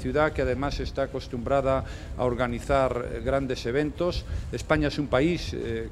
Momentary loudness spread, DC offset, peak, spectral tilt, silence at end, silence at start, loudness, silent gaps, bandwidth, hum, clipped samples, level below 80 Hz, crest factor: 7 LU; under 0.1%; -6 dBFS; -6.5 dB/octave; 0 s; 0 s; -27 LUFS; none; 13.5 kHz; none; under 0.1%; -38 dBFS; 20 dB